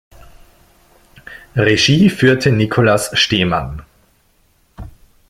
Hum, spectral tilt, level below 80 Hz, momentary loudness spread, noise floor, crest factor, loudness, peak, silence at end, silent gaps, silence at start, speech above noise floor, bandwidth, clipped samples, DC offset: none; -5 dB/octave; -40 dBFS; 14 LU; -56 dBFS; 16 dB; -13 LUFS; 0 dBFS; 0.4 s; none; 1.3 s; 43 dB; 15.5 kHz; under 0.1%; under 0.1%